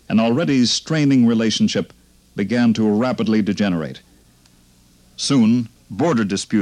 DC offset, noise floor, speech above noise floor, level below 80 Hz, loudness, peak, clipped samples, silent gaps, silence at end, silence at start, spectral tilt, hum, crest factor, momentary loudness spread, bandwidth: under 0.1%; -52 dBFS; 35 dB; -56 dBFS; -18 LUFS; -6 dBFS; under 0.1%; none; 0 s; 0.1 s; -5.5 dB/octave; none; 12 dB; 10 LU; 10.5 kHz